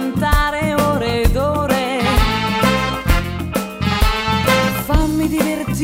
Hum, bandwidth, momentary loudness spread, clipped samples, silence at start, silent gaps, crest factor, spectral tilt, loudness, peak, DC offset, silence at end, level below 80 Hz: none; 16.5 kHz; 4 LU; under 0.1%; 0 s; none; 14 dB; -5 dB/octave; -17 LUFS; -2 dBFS; 0.1%; 0 s; -22 dBFS